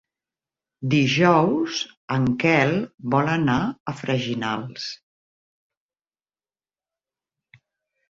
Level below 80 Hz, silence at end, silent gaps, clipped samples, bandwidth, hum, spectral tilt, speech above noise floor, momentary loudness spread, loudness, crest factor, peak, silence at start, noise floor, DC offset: -58 dBFS; 3.15 s; 1.97-2.08 s, 2.94-2.98 s, 3.80-3.86 s; under 0.1%; 7.8 kHz; none; -6 dB/octave; over 68 dB; 14 LU; -22 LUFS; 20 dB; -4 dBFS; 0.8 s; under -90 dBFS; under 0.1%